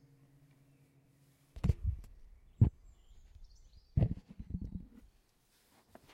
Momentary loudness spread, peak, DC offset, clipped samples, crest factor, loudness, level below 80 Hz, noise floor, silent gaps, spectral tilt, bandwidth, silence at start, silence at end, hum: 22 LU; -14 dBFS; under 0.1%; under 0.1%; 26 dB; -37 LUFS; -46 dBFS; -72 dBFS; none; -9.5 dB/octave; 8 kHz; 1.55 s; 1.3 s; none